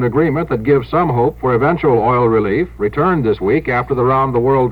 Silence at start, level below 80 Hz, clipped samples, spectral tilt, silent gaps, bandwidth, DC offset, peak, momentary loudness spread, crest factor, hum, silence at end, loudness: 0 s; -36 dBFS; under 0.1%; -10 dB/octave; none; 5.2 kHz; 0.3%; -2 dBFS; 4 LU; 12 dB; none; 0 s; -15 LUFS